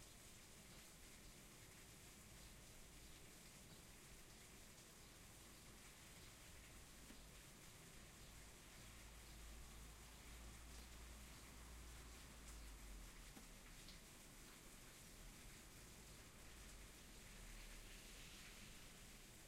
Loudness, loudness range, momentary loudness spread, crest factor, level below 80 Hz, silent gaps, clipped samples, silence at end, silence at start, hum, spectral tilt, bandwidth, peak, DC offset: -61 LUFS; 2 LU; 3 LU; 16 dB; -64 dBFS; none; under 0.1%; 0 s; 0 s; none; -2.5 dB/octave; 16 kHz; -44 dBFS; under 0.1%